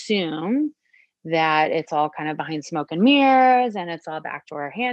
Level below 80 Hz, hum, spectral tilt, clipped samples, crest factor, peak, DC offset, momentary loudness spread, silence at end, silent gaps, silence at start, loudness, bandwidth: -74 dBFS; none; -5.5 dB/octave; under 0.1%; 16 dB; -6 dBFS; under 0.1%; 16 LU; 0 s; none; 0 s; -21 LUFS; 8.6 kHz